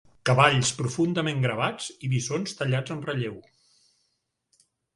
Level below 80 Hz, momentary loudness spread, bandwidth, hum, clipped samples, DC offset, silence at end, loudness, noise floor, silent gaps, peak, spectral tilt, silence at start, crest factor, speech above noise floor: -60 dBFS; 12 LU; 11.5 kHz; none; under 0.1%; under 0.1%; 1.55 s; -25 LUFS; -77 dBFS; none; -2 dBFS; -4.5 dB/octave; 0.25 s; 24 dB; 51 dB